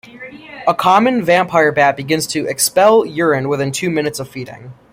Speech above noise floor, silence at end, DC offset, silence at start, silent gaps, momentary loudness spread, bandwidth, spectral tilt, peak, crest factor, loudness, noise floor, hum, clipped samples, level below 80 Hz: 20 dB; 0.2 s; under 0.1%; 0.15 s; none; 17 LU; 16.5 kHz; -4 dB/octave; 0 dBFS; 16 dB; -14 LUFS; -35 dBFS; none; under 0.1%; -56 dBFS